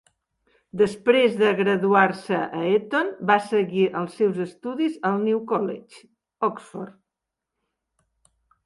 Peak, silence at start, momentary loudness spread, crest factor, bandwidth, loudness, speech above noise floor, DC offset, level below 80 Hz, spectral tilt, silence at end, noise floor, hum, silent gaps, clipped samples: -4 dBFS; 0.75 s; 12 LU; 20 dB; 11.5 kHz; -22 LUFS; 63 dB; under 0.1%; -68 dBFS; -6.5 dB/octave; 1.75 s; -85 dBFS; none; none; under 0.1%